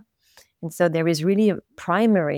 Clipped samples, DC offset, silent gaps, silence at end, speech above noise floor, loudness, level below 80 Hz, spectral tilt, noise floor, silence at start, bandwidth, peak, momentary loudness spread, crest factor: under 0.1%; under 0.1%; none; 0 s; 36 dB; -21 LUFS; -70 dBFS; -6.5 dB/octave; -57 dBFS; 0.6 s; 16.5 kHz; -6 dBFS; 13 LU; 16 dB